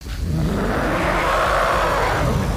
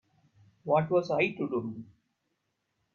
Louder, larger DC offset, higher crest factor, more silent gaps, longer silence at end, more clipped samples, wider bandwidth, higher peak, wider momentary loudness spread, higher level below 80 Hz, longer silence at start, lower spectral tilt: first, -19 LUFS vs -29 LUFS; neither; second, 12 dB vs 18 dB; neither; second, 0 s vs 1.1 s; neither; first, 16 kHz vs 7 kHz; first, -8 dBFS vs -14 dBFS; second, 4 LU vs 17 LU; first, -28 dBFS vs -72 dBFS; second, 0 s vs 0.65 s; second, -5.5 dB/octave vs -7.5 dB/octave